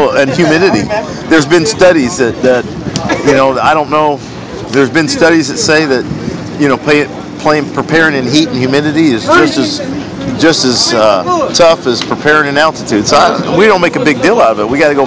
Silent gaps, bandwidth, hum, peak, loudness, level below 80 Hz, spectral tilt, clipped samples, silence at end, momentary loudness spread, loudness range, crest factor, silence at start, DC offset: none; 8 kHz; none; 0 dBFS; -9 LUFS; -38 dBFS; -4.5 dB/octave; 3%; 0 s; 8 LU; 2 LU; 10 dB; 0 s; 0.4%